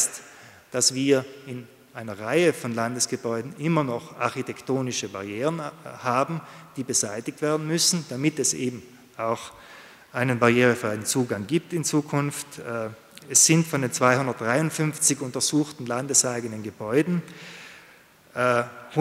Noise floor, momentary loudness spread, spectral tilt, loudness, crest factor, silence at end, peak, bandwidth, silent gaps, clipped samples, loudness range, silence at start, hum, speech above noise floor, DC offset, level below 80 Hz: -53 dBFS; 17 LU; -3.5 dB/octave; -24 LUFS; 22 dB; 0 s; -2 dBFS; 16 kHz; none; under 0.1%; 6 LU; 0 s; none; 28 dB; under 0.1%; -70 dBFS